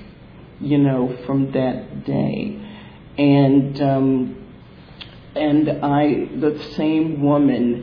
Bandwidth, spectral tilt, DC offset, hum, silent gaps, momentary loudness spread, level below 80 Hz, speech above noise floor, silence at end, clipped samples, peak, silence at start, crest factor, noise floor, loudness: 5.4 kHz; -10 dB/octave; under 0.1%; none; none; 17 LU; -50 dBFS; 24 dB; 0 s; under 0.1%; -4 dBFS; 0 s; 14 dB; -42 dBFS; -19 LUFS